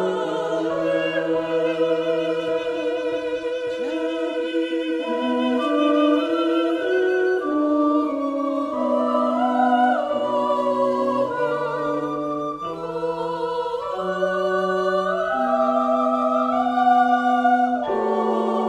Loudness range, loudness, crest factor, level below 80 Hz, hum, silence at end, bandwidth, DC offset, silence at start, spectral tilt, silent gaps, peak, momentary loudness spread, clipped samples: 5 LU; -22 LUFS; 14 dB; -62 dBFS; none; 0 s; 11.5 kHz; under 0.1%; 0 s; -6 dB/octave; none; -6 dBFS; 7 LU; under 0.1%